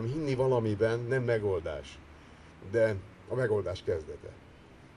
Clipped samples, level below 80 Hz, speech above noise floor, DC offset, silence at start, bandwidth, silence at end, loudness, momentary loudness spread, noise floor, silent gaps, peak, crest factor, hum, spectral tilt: under 0.1%; -56 dBFS; 23 dB; under 0.1%; 0 s; 11 kHz; 0.1 s; -31 LUFS; 18 LU; -54 dBFS; none; -14 dBFS; 16 dB; none; -7.5 dB/octave